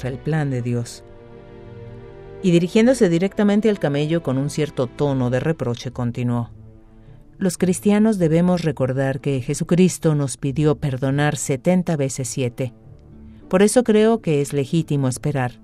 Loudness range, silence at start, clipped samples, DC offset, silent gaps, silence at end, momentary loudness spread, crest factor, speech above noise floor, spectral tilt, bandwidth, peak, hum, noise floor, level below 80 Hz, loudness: 3 LU; 0 s; under 0.1%; under 0.1%; none; 0.1 s; 10 LU; 18 dB; 25 dB; -6.5 dB/octave; 14.5 kHz; -2 dBFS; none; -44 dBFS; -46 dBFS; -20 LUFS